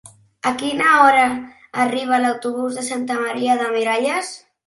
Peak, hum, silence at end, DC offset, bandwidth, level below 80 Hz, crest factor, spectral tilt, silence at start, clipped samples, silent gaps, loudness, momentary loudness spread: 0 dBFS; none; 0.3 s; under 0.1%; 11.5 kHz; -64 dBFS; 18 dB; -3 dB/octave; 0.45 s; under 0.1%; none; -18 LUFS; 12 LU